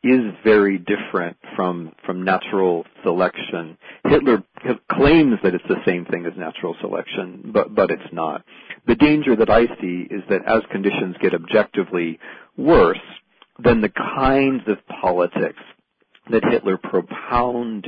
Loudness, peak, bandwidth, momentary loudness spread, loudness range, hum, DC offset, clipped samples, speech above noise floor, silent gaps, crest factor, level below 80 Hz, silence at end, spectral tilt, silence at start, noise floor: -19 LUFS; -2 dBFS; 5.2 kHz; 13 LU; 3 LU; none; under 0.1%; under 0.1%; 41 dB; none; 18 dB; -40 dBFS; 0 s; -10 dB/octave; 0.05 s; -59 dBFS